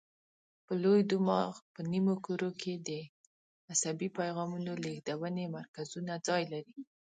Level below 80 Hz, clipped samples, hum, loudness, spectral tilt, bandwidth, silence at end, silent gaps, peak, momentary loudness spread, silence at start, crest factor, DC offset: -80 dBFS; under 0.1%; none; -35 LUFS; -5 dB/octave; 9.6 kHz; 0.2 s; 1.62-1.75 s, 3.09-3.68 s, 5.68-5.74 s; -16 dBFS; 14 LU; 0.7 s; 18 dB; under 0.1%